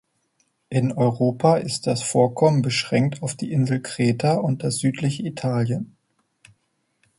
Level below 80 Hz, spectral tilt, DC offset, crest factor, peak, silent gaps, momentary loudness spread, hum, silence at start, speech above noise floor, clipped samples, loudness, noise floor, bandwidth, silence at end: -60 dBFS; -6 dB/octave; under 0.1%; 20 dB; -4 dBFS; none; 7 LU; none; 0.7 s; 50 dB; under 0.1%; -22 LUFS; -71 dBFS; 11.5 kHz; 1.35 s